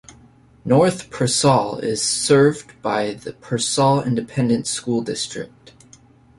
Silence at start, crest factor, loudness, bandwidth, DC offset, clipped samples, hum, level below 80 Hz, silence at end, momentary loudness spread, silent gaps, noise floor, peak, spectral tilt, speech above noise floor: 0.1 s; 18 dB; -19 LUFS; 11.5 kHz; under 0.1%; under 0.1%; none; -54 dBFS; 0.95 s; 12 LU; none; -50 dBFS; -2 dBFS; -4.5 dB/octave; 31 dB